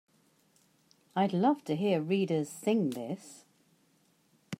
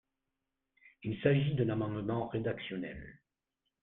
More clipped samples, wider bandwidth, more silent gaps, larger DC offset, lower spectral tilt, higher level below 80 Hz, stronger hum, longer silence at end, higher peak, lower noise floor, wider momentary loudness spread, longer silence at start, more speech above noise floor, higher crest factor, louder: neither; first, 16 kHz vs 4 kHz; neither; neither; second, -6.5 dB/octave vs -10.5 dB/octave; second, -82 dBFS vs -62 dBFS; neither; second, 0.05 s vs 0.65 s; about the same, -16 dBFS vs -14 dBFS; second, -69 dBFS vs -87 dBFS; second, 12 LU vs 15 LU; first, 1.15 s vs 0.85 s; second, 39 dB vs 53 dB; about the same, 18 dB vs 22 dB; first, -31 LUFS vs -34 LUFS